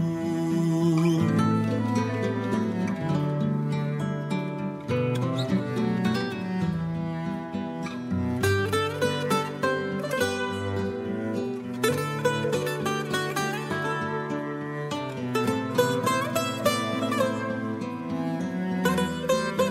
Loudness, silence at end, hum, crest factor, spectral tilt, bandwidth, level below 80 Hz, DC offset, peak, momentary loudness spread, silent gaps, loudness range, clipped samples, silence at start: -27 LUFS; 0 s; none; 16 dB; -6 dB/octave; 16 kHz; -60 dBFS; under 0.1%; -10 dBFS; 7 LU; none; 3 LU; under 0.1%; 0 s